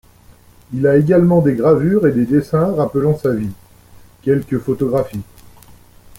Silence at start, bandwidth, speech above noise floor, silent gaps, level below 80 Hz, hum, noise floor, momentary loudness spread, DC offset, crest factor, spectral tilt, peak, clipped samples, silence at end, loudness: 0.7 s; 16.5 kHz; 31 dB; none; -46 dBFS; 60 Hz at -40 dBFS; -46 dBFS; 12 LU; under 0.1%; 14 dB; -9.5 dB/octave; -2 dBFS; under 0.1%; 0.95 s; -15 LUFS